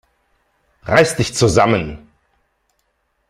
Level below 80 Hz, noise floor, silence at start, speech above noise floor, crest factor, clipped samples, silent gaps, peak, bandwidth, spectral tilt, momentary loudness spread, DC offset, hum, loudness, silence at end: -42 dBFS; -67 dBFS; 0.85 s; 52 dB; 20 dB; under 0.1%; none; 0 dBFS; 15 kHz; -4.5 dB/octave; 19 LU; under 0.1%; none; -15 LUFS; 1.3 s